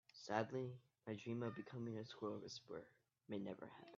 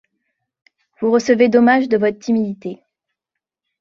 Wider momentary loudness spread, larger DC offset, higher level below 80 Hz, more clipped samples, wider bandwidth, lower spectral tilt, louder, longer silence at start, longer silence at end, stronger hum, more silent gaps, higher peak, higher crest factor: about the same, 12 LU vs 13 LU; neither; second, -86 dBFS vs -62 dBFS; neither; about the same, 7.2 kHz vs 7.4 kHz; about the same, -5.5 dB/octave vs -6 dB/octave; second, -49 LUFS vs -16 LUFS; second, 0.15 s vs 1 s; second, 0 s vs 1.05 s; neither; neither; second, -26 dBFS vs -2 dBFS; first, 24 dB vs 16 dB